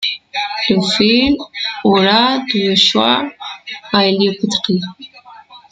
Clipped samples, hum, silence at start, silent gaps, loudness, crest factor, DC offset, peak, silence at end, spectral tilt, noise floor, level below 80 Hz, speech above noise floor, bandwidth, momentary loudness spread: under 0.1%; none; 0 s; none; -14 LUFS; 16 dB; under 0.1%; 0 dBFS; 0.15 s; -4.5 dB/octave; -40 dBFS; -48 dBFS; 26 dB; 9.2 kHz; 12 LU